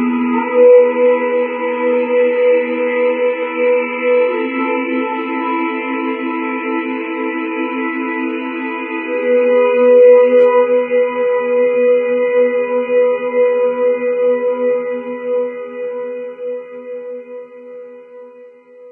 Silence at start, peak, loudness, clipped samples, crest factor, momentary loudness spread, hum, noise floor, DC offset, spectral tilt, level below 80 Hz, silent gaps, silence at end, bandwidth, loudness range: 0 s; 0 dBFS; -15 LUFS; under 0.1%; 14 dB; 15 LU; none; -40 dBFS; under 0.1%; -7.5 dB/octave; under -90 dBFS; none; 0 s; 3.5 kHz; 9 LU